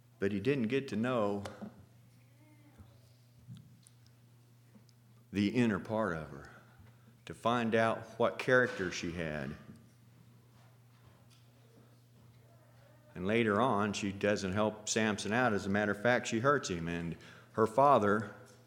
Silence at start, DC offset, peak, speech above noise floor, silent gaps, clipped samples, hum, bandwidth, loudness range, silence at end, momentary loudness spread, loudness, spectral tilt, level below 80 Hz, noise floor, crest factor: 0.2 s; under 0.1%; -14 dBFS; 30 dB; none; under 0.1%; none; 16.5 kHz; 11 LU; 0.2 s; 20 LU; -32 LUFS; -5 dB/octave; -68 dBFS; -62 dBFS; 22 dB